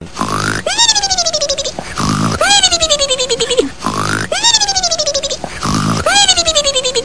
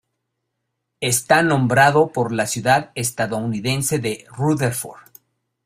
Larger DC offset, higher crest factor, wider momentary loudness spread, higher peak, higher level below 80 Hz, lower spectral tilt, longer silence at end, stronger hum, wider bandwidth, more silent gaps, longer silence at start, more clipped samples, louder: first, 2% vs under 0.1%; second, 14 dB vs 20 dB; about the same, 10 LU vs 10 LU; about the same, 0 dBFS vs 0 dBFS; first, -36 dBFS vs -56 dBFS; second, -2 dB/octave vs -4.5 dB/octave; second, 0 s vs 0.65 s; neither; second, 10.5 kHz vs 16 kHz; neither; second, 0 s vs 1 s; neither; first, -12 LUFS vs -19 LUFS